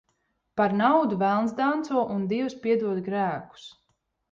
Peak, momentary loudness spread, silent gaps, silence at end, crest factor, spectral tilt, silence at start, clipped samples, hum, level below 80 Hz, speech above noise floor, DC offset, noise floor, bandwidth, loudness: -8 dBFS; 8 LU; none; 0.6 s; 18 dB; -7 dB/octave; 0.55 s; under 0.1%; none; -68 dBFS; 50 dB; under 0.1%; -75 dBFS; 7.6 kHz; -25 LUFS